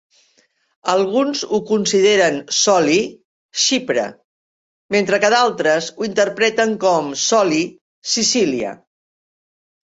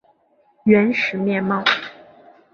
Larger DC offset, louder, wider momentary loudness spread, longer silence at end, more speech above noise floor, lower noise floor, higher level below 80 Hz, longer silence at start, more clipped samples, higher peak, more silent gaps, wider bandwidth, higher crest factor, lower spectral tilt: neither; about the same, -17 LUFS vs -18 LUFS; about the same, 9 LU vs 9 LU; first, 1.25 s vs 0.6 s; about the same, 44 dB vs 42 dB; about the same, -60 dBFS vs -59 dBFS; about the same, -62 dBFS vs -62 dBFS; first, 0.85 s vs 0.65 s; neither; about the same, -2 dBFS vs -2 dBFS; first, 3.25-3.49 s, 4.24-4.89 s, 7.81-8.02 s vs none; first, 8 kHz vs 6.8 kHz; about the same, 16 dB vs 18 dB; second, -2.5 dB/octave vs -6.5 dB/octave